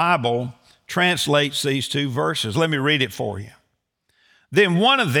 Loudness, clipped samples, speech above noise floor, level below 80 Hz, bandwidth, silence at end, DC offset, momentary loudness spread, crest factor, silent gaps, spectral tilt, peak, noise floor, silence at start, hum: -20 LUFS; under 0.1%; 51 dB; -64 dBFS; over 20 kHz; 0 s; under 0.1%; 12 LU; 18 dB; none; -4.5 dB/octave; -4 dBFS; -71 dBFS; 0 s; none